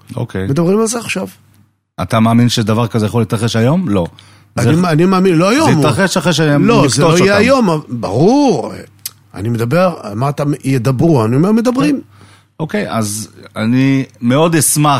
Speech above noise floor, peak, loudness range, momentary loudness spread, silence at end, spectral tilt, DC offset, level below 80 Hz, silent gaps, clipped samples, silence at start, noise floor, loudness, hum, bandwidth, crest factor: 39 dB; 0 dBFS; 4 LU; 11 LU; 0 s; -5.5 dB/octave; under 0.1%; -46 dBFS; none; under 0.1%; 0.1 s; -51 dBFS; -12 LUFS; none; 16 kHz; 12 dB